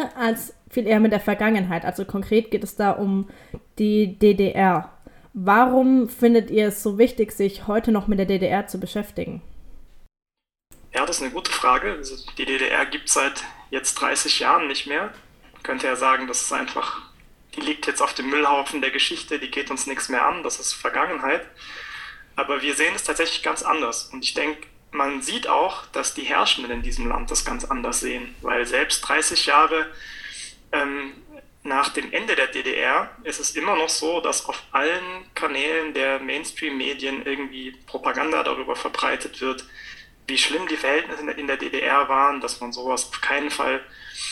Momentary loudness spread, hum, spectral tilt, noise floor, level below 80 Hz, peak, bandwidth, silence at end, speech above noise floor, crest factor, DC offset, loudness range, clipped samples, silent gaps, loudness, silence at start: 13 LU; none; -3 dB/octave; -55 dBFS; -42 dBFS; -2 dBFS; 18.5 kHz; 0 s; 32 dB; 20 dB; under 0.1%; 6 LU; under 0.1%; none; -22 LUFS; 0 s